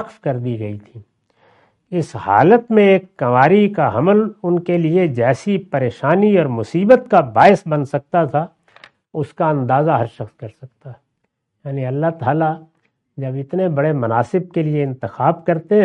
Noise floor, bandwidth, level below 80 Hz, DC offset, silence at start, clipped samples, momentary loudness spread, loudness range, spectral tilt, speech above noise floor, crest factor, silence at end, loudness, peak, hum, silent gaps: -71 dBFS; 9.6 kHz; -60 dBFS; under 0.1%; 0 s; under 0.1%; 15 LU; 8 LU; -8.5 dB/octave; 56 dB; 16 dB; 0 s; -16 LUFS; 0 dBFS; none; none